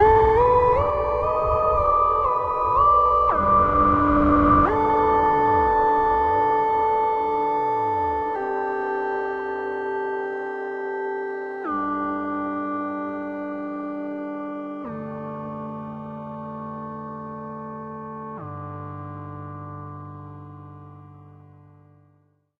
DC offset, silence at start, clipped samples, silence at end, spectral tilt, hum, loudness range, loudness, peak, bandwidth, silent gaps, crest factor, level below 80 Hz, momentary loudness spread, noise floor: under 0.1%; 0 s; under 0.1%; 1.3 s; -9 dB/octave; none; 18 LU; -22 LUFS; -6 dBFS; 6.6 kHz; none; 18 dB; -40 dBFS; 18 LU; -63 dBFS